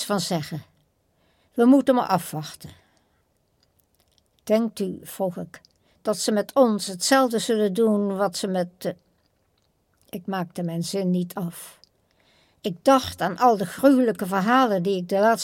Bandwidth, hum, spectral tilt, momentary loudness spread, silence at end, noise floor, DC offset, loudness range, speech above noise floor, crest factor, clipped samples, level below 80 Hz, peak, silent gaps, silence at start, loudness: 17 kHz; none; -5 dB/octave; 16 LU; 0 s; -68 dBFS; under 0.1%; 9 LU; 46 dB; 20 dB; under 0.1%; -64 dBFS; -4 dBFS; none; 0 s; -23 LUFS